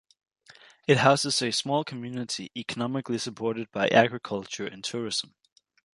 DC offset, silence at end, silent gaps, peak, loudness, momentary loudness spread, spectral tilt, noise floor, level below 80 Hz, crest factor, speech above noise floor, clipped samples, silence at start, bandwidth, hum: under 0.1%; 0.75 s; none; -4 dBFS; -27 LUFS; 13 LU; -4 dB/octave; -55 dBFS; -68 dBFS; 24 dB; 28 dB; under 0.1%; 0.9 s; 11.5 kHz; none